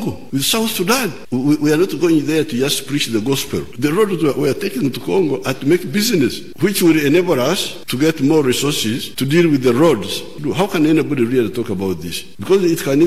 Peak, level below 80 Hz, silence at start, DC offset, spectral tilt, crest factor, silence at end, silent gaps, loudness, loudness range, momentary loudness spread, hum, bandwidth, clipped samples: -2 dBFS; -50 dBFS; 0 s; 2%; -5 dB/octave; 14 dB; 0 s; none; -16 LUFS; 2 LU; 7 LU; none; 15.5 kHz; under 0.1%